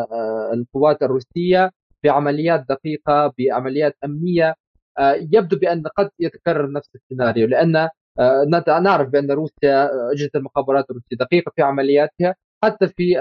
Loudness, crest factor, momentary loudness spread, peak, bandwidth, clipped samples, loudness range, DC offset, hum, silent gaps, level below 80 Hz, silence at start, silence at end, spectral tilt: -18 LUFS; 14 dB; 7 LU; -4 dBFS; 6.6 kHz; under 0.1%; 2 LU; under 0.1%; none; 1.76-1.90 s, 4.60-4.74 s, 4.82-4.95 s, 7.03-7.10 s, 7.97-8.15 s, 12.44-12.61 s; -56 dBFS; 0 s; 0 s; -5.5 dB/octave